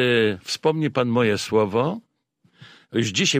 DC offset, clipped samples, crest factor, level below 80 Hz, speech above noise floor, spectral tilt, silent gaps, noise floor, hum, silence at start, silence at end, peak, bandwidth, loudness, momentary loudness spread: under 0.1%; under 0.1%; 16 dB; -62 dBFS; 44 dB; -4.5 dB/octave; none; -65 dBFS; none; 0 s; 0 s; -6 dBFS; 15.5 kHz; -22 LUFS; 6 LU